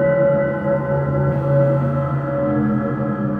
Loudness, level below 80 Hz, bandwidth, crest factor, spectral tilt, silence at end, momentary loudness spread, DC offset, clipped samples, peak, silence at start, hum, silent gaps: -19 LUFS; -42 dBFS; 3.4 kHz; 12 dB; -11.5 dB/octave; 0 s; 5 LU; under 0.1%; under 0.1%; -6 dBFS; 0 s; none; none